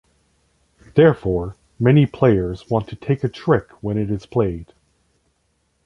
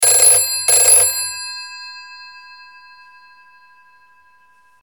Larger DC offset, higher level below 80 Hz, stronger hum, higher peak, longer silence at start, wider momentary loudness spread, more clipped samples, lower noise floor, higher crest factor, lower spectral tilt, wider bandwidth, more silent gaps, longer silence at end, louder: second, under 0.1% vs 0.2%; first, -42 dBFS vs -58 dBFS; neither; about the same, -2 dBFS vs 0 dBFS; first, 0.95 s vs 0 s; second, 9 LU vs 25 LU; neither; first, -67 dBFS vs -53 dBFS; about the same, 18 dB vs 18 dB; first, -9.5 dB/octave vs 2.5 dB/octave; second, 6.8 kHz vs 19 kHz; neither; second, 1.2 s vs 2.45 s; second, -19 LUFS vs -10 LUFS